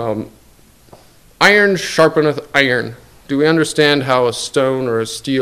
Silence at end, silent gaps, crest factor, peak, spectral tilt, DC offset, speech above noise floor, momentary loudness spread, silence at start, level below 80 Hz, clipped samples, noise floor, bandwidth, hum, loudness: 0 s; none; 16 dB; 0 dBFS; -4.5 dB/octave; 0.2%; 33 dB; 11 LU; 0 s; -52 dBFS; 0.2%; -47 dBFS; 16 kHz; none; -14 LUFS